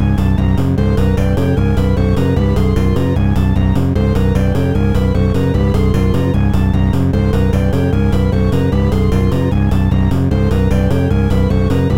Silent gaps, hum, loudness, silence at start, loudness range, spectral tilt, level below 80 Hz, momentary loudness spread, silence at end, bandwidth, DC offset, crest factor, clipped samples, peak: none; none; -14 LUFS; 0 s; 0 LU; -8.5 dB/octave; -18 dBFS; 1 LU; 0 s; 15.5 kHz; 3%; 10 dB; under 0.1%; -2 dBFS